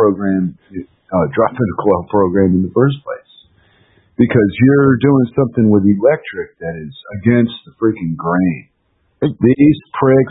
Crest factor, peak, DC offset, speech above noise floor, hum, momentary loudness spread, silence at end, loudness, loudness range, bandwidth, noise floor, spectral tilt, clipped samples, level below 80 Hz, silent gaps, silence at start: 14 dB; 0 dBFS; under 0.1%; 48 dB; none; 15 LU; 0 s; -14 LUFS; 4 LU; 4 kHz; -61 dBFS; -13 dB/octave; under 0.1%; -48 dBFS; none; 0 s